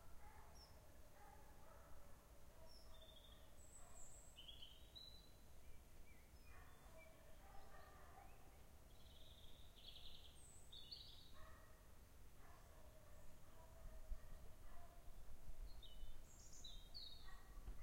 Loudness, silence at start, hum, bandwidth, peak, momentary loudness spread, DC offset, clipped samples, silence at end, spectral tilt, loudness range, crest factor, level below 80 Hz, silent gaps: -64 LUFS; 0 s; none; 16 kHz; -38 dBFS; 8 LU; under 0.1%; under 0.1%; 0 s; -3 dB/octave; 4 LU; 20 dB; -62 dBFS; none